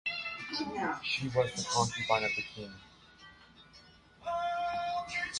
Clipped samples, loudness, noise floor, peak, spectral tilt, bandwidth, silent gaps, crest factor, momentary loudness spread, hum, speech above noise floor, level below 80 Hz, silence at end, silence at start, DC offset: under 0.1%; -33 LUFS; -59 dBFS; -14 dBFS; -3 dB/octave; 11.5 kHz; none; 22 dB; 17 LU; none; 25 dB; -64 dBFS; 0 s; 0.05 s; under 0.1%